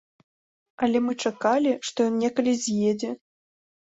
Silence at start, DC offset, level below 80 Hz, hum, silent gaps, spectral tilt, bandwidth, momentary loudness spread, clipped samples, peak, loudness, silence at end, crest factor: 0.8 s; under 0.1%; -68 dBFS; none; none; -4.5 dB/octave; 8 kHz; 6 LU; under 0.1%; -10 dBFS; -25 LUFS; 0.8 s; 16 dB